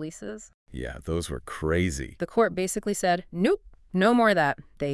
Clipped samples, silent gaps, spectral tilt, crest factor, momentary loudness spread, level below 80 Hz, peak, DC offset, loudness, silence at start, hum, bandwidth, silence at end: under 0.1%; 0.54-0.66 s; -5 dB/octave; 18 dB; 17 LU; -46 dBFS; -8 dBFS; under 0.1%; -26 LUFS; 0 s; none; 12 kHz; 0 s